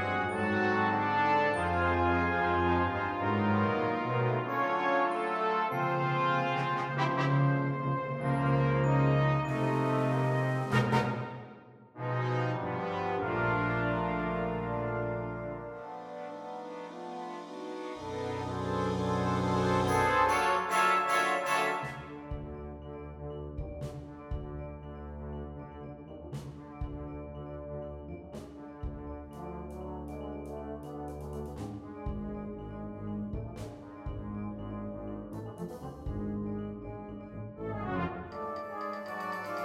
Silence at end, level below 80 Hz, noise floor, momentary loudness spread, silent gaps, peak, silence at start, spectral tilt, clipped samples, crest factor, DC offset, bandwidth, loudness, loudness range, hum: 0 s; -50 dBFS; -52 dBFS; 16 LU; none; -14 dBFS; 0 s; -6.5 dB/octave; under 0.1%; 18 dB; under 0.1%; 16 kHz; -32 LUFS; 14 LU; none